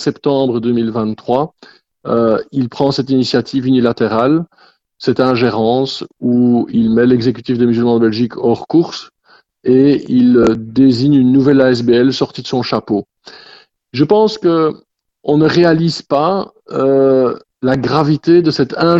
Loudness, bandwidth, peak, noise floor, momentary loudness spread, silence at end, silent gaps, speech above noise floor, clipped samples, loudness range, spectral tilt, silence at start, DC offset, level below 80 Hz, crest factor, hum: -13 LUFS; 7.8 kHz; 0 dBFS; -51 dBFS; 9 LU; 0 s; none; 38 dB; under 0.1%; 4 LU; -7.5 dB/octave; 0 s; under 0.1%; -48 dBFS; 12 dB; none